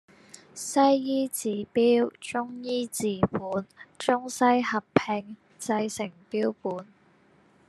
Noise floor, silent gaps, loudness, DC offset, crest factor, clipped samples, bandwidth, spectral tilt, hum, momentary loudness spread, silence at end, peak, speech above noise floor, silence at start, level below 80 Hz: -61 dBFS; none; -27 LUFS; under 0.1%; 24 dB; under 0.1%; 13 kHz; -4.5 dB/octave; none; 13 LU; 0.85 s; -4 dBFS; 34 dB; 0.55 s; -64 dBFS